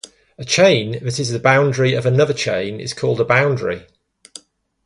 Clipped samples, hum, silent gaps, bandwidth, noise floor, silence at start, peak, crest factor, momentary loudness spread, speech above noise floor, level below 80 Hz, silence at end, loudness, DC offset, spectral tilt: under 0.1%; none; none; 11.5 kHz; -43 dBFS; 0.4 s; 0 dBFS; 18 dB; 10 LU; 27 dB; -54 dBFS; 1.05 s; -17 LUFS; under 0.1%; -5 dB/octave